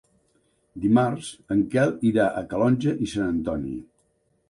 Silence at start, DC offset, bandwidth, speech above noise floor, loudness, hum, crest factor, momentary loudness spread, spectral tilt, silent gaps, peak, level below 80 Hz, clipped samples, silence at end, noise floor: 0.75 s; under 0.1%; 11.5 kHz; 45 dB; -24 LUFS; none; 16 dB; 9 LU; -7 dB/octave; none; -8 dBFS; -52 dBFS; under 0.1%; 0.65 s; -68 dBFS